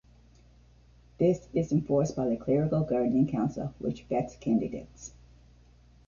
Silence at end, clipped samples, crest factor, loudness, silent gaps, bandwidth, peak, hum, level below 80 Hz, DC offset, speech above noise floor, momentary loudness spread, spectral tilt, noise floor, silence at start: 1 s; under 0.1%; 16 dB; -29 LUFS; none; 7.2 kHz; -14 dBFS; none; -54 dBFS; under 0.1%; 29 dB; 11 LU; -8.5 dB/octave; -58 dBFS; 1.2 s